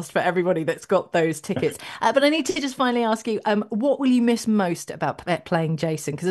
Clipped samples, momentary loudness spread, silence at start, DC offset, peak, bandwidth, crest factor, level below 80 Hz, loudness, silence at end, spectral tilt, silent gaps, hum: under 0.1%; 7 LU; 0 s; under 0.1%; -6 dBFS; 12.5 kHz; 16 dB; -62 dBFS; -23 LUFS; 0 s; -5 dB/octave; none; none